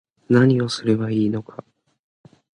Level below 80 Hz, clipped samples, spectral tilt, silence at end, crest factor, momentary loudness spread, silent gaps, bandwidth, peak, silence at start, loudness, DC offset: -60 dBFS; under 0.1%; -7 dB/octave; 1.1 s; 18 dB; 19 LU; none; 11 kHz; -4 dBFS; 0.3 s; -20 LUFS; under 0.1%